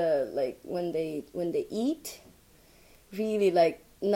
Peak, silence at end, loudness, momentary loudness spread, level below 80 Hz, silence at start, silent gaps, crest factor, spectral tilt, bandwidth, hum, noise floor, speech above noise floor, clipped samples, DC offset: -12 dBFS; 0 s; -30 LUFS; 13 LU; -64 dBFS; 0 s; none; 18 dB; -5.5 dB/octave; 17 kHz; none; -58 dBFS; 30 dB; under 0.1%; under 0.1%